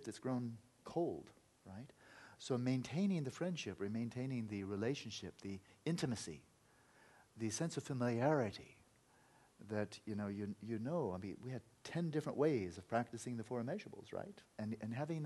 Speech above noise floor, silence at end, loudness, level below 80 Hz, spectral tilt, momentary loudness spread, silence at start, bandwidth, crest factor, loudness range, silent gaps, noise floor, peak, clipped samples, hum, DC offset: 29 dB; 0 s; -43 LUFS; -78 dBFS; -6 dB/octave; 16 LU; 0 s; 12 kHz; 20 dB; 3 LU; none; -71 dBFS; -22 dBFS; under 0.1%; none; under 0.1%